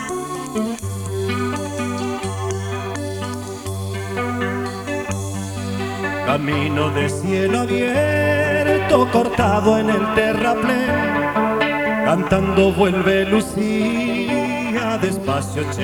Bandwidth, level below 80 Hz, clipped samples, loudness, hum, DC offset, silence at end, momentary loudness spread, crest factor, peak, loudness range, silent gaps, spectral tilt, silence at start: 19.5 kHz; -44 dBFS; under 0.1%; -19 LUFS; none; under 0.1%; 0 s; 10 LU; 18 dB; -2 dBFS; 8 LU; none; -5.5 dB/octave; 0 s